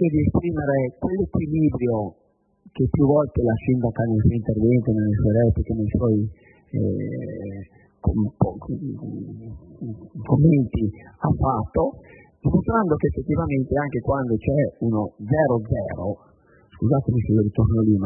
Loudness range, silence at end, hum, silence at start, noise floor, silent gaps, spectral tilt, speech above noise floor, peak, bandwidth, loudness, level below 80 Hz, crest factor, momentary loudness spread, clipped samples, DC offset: 5 LU; 0 s; none; 0 s; -55 dBFS; none; -14.5 dB/octave; 33 dB; -4 dBFS; 3.1 kHz; -22 LUFS; -38 dBFS; 16 dB; 13 LU; under 0.1%; under 0.1%